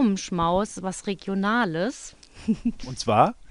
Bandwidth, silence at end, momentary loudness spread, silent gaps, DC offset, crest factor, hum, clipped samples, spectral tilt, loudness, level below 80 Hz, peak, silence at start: 11 kHz; 0.05 s; 10 LU; none; under 0.1%; 20 dB; none; under 0.1%; -5.5 dB/octave; -25 LUFS; -48 dBFS; -4 dBFS; 0 s